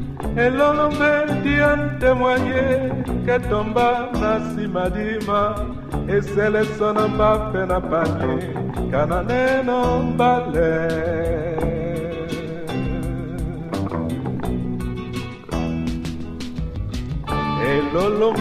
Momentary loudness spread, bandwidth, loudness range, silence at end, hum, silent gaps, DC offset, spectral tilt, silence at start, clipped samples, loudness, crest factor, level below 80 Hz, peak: 10 LU; 15 kHz; 7 LU; 0 s; none; none; under 0.1%; -7 dB/octave; 0 s; under 0.1%; -21 LUFS; 16 dB; -34 dBFS; -4 dBFS